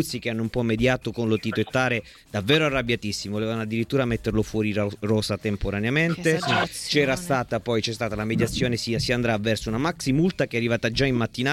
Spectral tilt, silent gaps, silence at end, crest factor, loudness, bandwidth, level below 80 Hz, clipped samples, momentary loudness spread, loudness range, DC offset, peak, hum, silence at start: -5.5 dB/octave; none; 0 s; 18 dB; -24 LUFS; 16 kHz; -44 dBFS; under 0.1%; 5 LU; 1 LU; under 0.1%; -6 dBFS; none; 0 s